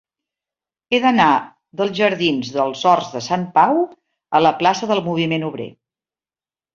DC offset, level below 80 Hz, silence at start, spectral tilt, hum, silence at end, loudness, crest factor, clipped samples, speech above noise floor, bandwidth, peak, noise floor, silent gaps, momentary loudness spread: under 0.1%; -62 dBFS; 0.9 s; -5 dB/octave; none; 1.05 s; -18 LUFS; 18 dB; under 0.1%; over 73 dB; 7.4 kHz; 0 dBFS; under -90 dBFS; none; 9 LU